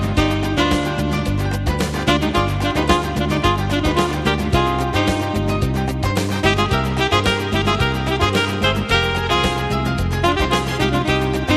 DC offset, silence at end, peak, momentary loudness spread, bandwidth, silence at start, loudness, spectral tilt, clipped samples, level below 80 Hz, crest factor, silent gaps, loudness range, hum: under 0.1%; 0 s; -2 dBFS; 3 LU; 14 kHz; 0 s; -18 LUFS; -5.5 dB/octave; under 0.1%; -28 dBFS; 16 dB; none; 1 LU; none